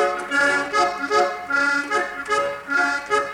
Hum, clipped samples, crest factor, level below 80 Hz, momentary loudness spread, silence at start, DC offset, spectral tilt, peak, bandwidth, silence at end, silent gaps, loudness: none; under 0.1%; 14 dB; -58 dBFS; 4 LU; 0 s; under 0.1%; -2 dB/octave; -6 dBFS; 18.5 kHz; 0 s; none; -21 LUFS